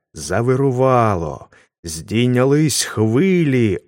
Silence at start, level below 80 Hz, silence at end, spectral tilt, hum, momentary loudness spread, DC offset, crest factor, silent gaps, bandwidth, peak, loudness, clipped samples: 0.15 s; -46 dBFS; 0.1 s; -5.5 dB/octave; none; 14 LU; under 0.1%; 16 dB; 1.79-1.83 s; 16.5 kHz; -2 dBFS; -16 LUFS; under 0.1%